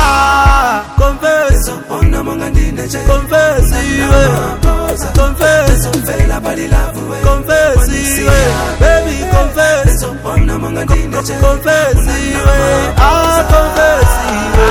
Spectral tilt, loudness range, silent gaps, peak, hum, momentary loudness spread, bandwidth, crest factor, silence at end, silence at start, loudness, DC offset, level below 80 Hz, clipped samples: -5 dB/octave; 2 LU; none; 0 dBFS; none; 6 LU; 18 kHz; 10 dB; 0 s; 0 s; -11 LUFS; under 0.1%; -14 dBFS; 1%